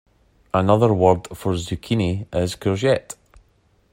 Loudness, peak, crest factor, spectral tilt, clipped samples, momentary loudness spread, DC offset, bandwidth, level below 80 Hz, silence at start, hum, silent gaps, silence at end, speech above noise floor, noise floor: -20 LUFS; -2 dBFS; 20 dB; -6.5 dB/octave; under 0.1%; 9 LU; under 0.1%; 16 kHz; -48 dBFS; 0.55 s; none; none; 0.8 s; 41 dB; -60 dBFS